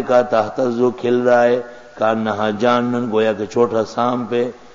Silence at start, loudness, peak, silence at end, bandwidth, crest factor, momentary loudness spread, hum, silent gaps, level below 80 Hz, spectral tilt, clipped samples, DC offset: 0 s; -17 LUFS; -2 dBFS; 0.2 s; 7.6 kHz; 16 dB; 6 LU; none; none; -58 dBFS; -6 dB/octave; under 0.1%; 0.4%